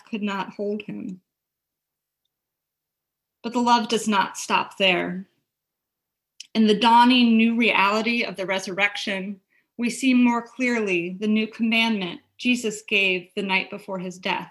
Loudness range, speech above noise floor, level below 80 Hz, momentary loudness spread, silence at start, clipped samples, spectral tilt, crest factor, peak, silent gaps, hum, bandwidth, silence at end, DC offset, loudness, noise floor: 8 LU; 62 dB; -72 dBFS; 14 LU; 0.1 s; under 0.1%; -4 dB/octave; 18 dB; -4 dBFS; none; none; 12.5 kHz; 0 s; under 0.1%; -22 LUFS; -84 dBFS